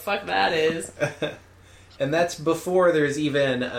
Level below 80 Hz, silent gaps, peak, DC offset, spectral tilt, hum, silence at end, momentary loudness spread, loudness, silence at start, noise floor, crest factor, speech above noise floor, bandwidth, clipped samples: -58 dBFS; none; -8 dBFS; under 0.1%; -4.5 dB/octave; none; 0 s; 9 LU; -23 LUFS; 0 s; -50 dBFS; 16 dB; 27 dB; 16.5 kHz; under 0.1%